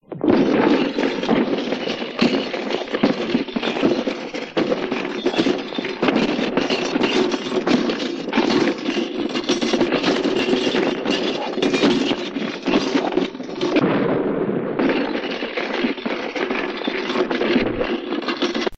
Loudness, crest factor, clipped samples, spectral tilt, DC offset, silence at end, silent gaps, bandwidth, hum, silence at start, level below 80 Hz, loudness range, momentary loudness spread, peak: -21 LUFS; 18 dB; under 0.1%; -5 dB/octave; under 0.1%; 0 s; none; 8.6 kHz; none; 0.1 s; -52 dBFS; 2 LU; 6 LU; -4 dBFS